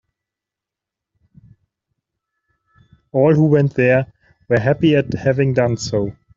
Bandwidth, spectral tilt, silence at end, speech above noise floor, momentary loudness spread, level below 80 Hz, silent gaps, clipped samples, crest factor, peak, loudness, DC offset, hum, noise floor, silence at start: 7.6 kHz; -7 dB/octave; 0.25 s; 70 dB; 8 LU; -50 dBFS; none; under 0.1%; 16 dB; -2 dBFS; -16 LUFS; under 0.1%; none; -86 dBFS; 3.15 s